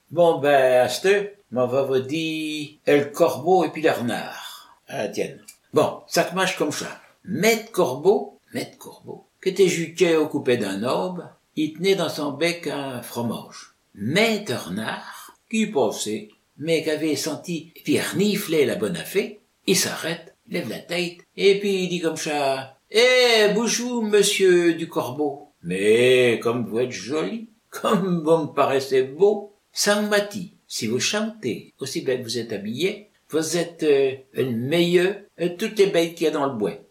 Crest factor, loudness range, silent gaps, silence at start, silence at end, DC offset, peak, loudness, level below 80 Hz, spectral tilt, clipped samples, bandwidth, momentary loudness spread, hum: 20 dB; 6 LU; none; 0.1 s; 0.1 s; under 0.1%; -4 dBFS; -22 LUFS; -72 dBFS; -4 dB/octave; under 0.1%; 16.5 kHz; 14 LU; none